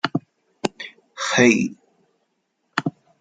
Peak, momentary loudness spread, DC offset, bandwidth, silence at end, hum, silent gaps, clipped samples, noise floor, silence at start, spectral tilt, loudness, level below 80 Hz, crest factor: 0 dBFS; 16 LU; under 0.1%; 9.4 kHz; 0.3 s; none; none; under 0.1%; -72 dBFS; 0.05 s; -4 dB/octave; -22 LUFS; -64 dBFS; 24 dB